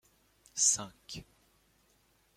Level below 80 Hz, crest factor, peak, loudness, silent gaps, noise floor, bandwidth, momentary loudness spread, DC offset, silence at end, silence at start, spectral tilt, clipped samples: -68 dBFS; 24 dB; -14 dBFS; -29 LUFS; none; -70 dBFS; 16.5 kHz; 20 LU; under 0.1%; 1.15 s; 0.55 s; 0 dB/octave; under 0.1%